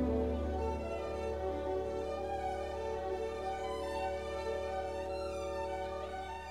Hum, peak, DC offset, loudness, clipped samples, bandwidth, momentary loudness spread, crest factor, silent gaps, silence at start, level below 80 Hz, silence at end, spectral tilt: none; -24 dBFS; 0.1%; -38 LUFS; under 0.1%; 13 kHz; 3 LU; 14 dB; none; 0 s; -46 dBFS; 0 s; -6.5 dB/octave